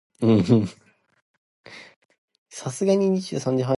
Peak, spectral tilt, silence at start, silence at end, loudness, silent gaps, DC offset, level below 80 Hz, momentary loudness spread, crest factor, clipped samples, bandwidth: -4 dBFS; -7 dB/octave; 0.2 s; 0 s; -22 LUFS; 1.22-1.64 s, 1.96-2.09 s, 2.18-2.28 s, 2.38-2.46 s; under 0.1%; -56 dBFS; 25 LU; 18 dB; under 0.1%; 11.5 kHz